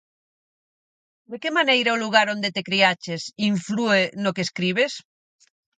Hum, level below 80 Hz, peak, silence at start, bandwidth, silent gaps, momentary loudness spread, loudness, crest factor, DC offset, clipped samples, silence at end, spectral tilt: none; -70 dBFS; -2 dBFS; 1.3 s; 9.4 kHz; none; 10 LU; -21 LUFS; 22 dB; under 0.1%; under 0.1%; 0.8 s; -4 dB/octave